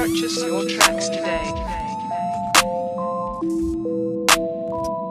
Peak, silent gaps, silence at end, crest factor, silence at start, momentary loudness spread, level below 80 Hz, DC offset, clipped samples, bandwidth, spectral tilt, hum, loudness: 0 dBFS; none; 0 s; 22 dB; 0 s; 9 LU; -42 dBFS; under 0.1%; under 0.1%; 15.5 kHz; -2.5 dB/octave; none; -21 LUFS